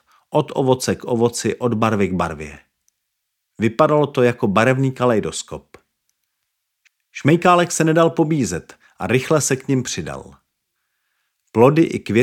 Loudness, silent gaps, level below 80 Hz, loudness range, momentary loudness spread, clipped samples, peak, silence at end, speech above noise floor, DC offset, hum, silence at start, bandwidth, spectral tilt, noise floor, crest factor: -18 LUFS; none; -54 dBFS; 4 LU; 14 LU; under 0.1%; -2 dBFS; 0 s; 58 dB; under 0.1%; none; 0.3 s; 16.5 kHz; -5.5 dB/octave; -76 dBFS; 18 dB